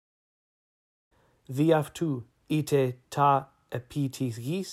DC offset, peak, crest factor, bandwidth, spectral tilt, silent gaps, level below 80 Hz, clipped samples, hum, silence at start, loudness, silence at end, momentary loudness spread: under 0.1%; -10 dBFS; 20 dB; 15.5 kHz; -6.5 dB/octave; none; -68 dBFS; under 0.1%; none; 1.5 s; -28 LUFS; 0 s; 13 LU